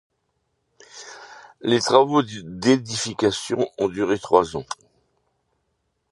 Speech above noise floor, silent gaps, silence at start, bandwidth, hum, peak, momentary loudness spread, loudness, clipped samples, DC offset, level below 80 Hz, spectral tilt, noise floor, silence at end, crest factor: 52 dB; none; 0.95 s; 11.5 kHz; none; -2 dBFS; 22 LU; -21 LUFS; under 0.1%; under 0.1%; -58 dBFS; -4.5 dB/octave; -73 dBFS; 1.4 s; 22 dB